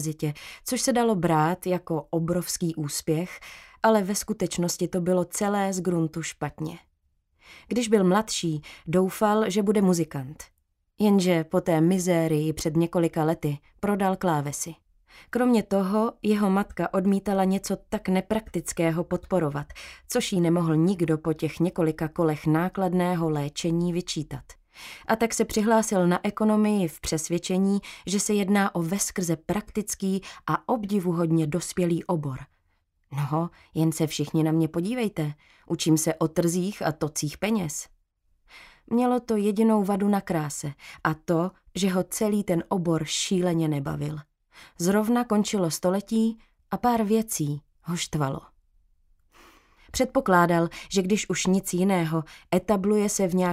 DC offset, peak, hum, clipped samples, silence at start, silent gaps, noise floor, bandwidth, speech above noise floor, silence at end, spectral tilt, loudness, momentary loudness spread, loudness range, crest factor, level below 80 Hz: under 0.1%; -6 dBFS; none; under 0.1%; 0 s; none; -70 dBFS; 16 kHz; 45 dB; 0 s; -5.5 dB/octave; -25 LUFS; 10 LU; 3 LU; 18 dB; -54 dBFS